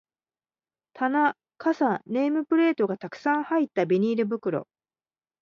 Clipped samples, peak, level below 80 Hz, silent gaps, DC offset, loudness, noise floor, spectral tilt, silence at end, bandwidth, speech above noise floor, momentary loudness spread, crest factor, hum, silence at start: under 0.1%; -10 dBFS; -76 dBFS; none; under 0.1%; -25 LUFS; under -90 dBFS; -7.5 dB/octave; 0.8 s; 6.8 kHz; over 66 dB; 7 LU; 16 dB; none; 0.95 s